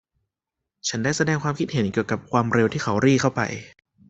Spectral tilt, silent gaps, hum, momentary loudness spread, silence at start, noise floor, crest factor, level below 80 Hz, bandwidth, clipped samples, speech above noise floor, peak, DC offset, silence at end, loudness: -5.5 dB/octave; none; none; 9 LU; 0.85 s; -85 dBFS; 20 dB; -56 dBFS; 8.2 kHz; under 0.1%; 62 dB; -4 dBFS; under 0.1%; 0.45 s; -23 LUFS